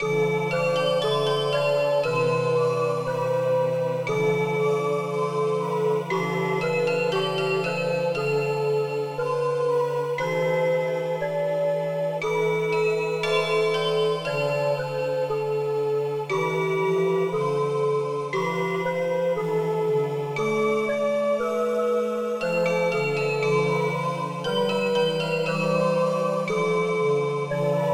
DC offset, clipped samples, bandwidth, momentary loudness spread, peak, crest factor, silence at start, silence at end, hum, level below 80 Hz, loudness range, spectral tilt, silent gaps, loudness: under 0.1%; under 0.1%; 15.5 kHz; 3 LU; -10 dBFS; 14 dB; 0 s; 0 s; none; -64 dBFS; 1 LU; -5.5 dB/octave; none; -24 LUFS